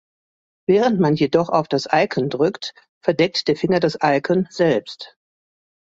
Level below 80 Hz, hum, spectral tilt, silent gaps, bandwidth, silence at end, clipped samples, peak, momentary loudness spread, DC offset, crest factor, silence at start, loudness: -60 dBFS; none; -6 dB/octave; 2.89-3.01 s; 7.8 kHz; 0.85 s; under 0.1%; -2 dBFS; 12 LU; under 0.1%; 18 dB; 0.7 s; -19 LUFS